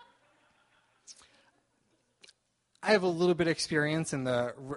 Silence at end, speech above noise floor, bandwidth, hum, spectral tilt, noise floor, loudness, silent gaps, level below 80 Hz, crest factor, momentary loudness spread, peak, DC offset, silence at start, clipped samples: 0 s; 45 dB; 11.5 kHz; none; -5 dB/octave; -74 dBFS; -29 LUFS; none; -68 dBFS; 22 dB; 5 LU; -10 dBFS; under 0.1%; 1.1 s; under 0.1%